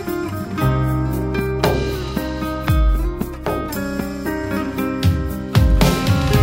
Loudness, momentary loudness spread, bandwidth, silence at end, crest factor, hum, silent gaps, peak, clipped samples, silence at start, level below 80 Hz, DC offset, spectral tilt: -20 LUFS; 8 LU; 16.5 kHz; 0 s; 18 dB; none; none; 0 dBFS; under 0.1%; 0 s; -24 dBFS; under 0.1%; -6.5 dB/octave